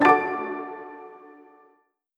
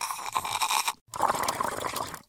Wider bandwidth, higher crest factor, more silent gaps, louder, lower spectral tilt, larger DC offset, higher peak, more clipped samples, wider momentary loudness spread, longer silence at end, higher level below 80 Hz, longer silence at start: second, 10.5 kHz vs 19 kHz; about the same, 22 dB vs 22 dB; second, none vs 1.01-1.06 s; first, -25 LUFS vs -29 LUFS; first, -6 dB/octave vs -1 dB/octave; neither; first, -4 dBFS vs -8 dBFS; neither; first, 24 LU vs 6 LU; first, 1 s vs 0.05 s; second, -74 dBFS vs -62 dBFS; about the same, 0 s vs 0 s